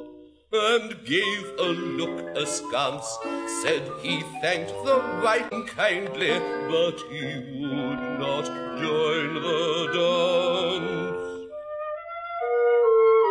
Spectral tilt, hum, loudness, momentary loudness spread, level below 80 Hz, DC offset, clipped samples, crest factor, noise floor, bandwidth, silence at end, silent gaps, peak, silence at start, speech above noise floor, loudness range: -3.5 dB/octave; none; -25 LUFS; 11 LU; -66 dBFS; under 0.1%; under 0.1%; 20 dB; -47 dBFS; 10.5 kHz; 0 s; none; -6 dBFS; 0 s; 21 dB; 2 LU